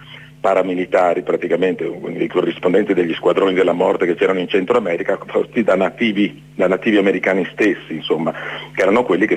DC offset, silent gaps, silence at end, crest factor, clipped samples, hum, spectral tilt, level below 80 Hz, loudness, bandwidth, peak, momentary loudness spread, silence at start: under 0.1%; none; 0 s; 14 dB; under 0.1%; none; -6.5 dB/octave; -58 dBFS; -17 LUFS; 9.6 kHz; -4 dBFS; 7 LU; 0 s